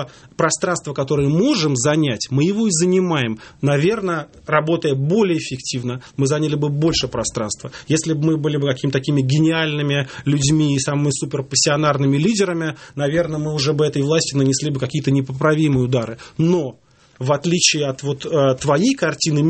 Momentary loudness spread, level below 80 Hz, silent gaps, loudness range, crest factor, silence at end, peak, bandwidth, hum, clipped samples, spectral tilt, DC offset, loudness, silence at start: 7 LU; -50 dBFS; none; 2 LU; 18 dB; 0 s; 0 dBFS; 8.8 kHz; none; under 0.1%; -5 dB/octave; under 0.1%; -18 LUFS; 0 s